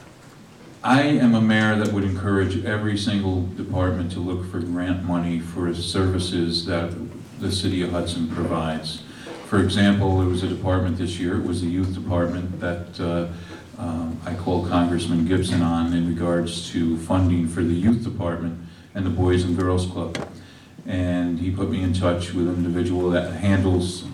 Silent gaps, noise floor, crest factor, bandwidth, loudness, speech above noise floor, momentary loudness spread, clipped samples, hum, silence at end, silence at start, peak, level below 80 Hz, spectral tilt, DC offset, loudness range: none; -45 dBFS; 16 dB; 12 kHz; -23 LUFS; 24 dB; 10 LU; under 0.1%; none; 0 s; 0 s; -8 dBFS; -46 dBFS; -6.5 dB/octave; under 0.1%; 4 LU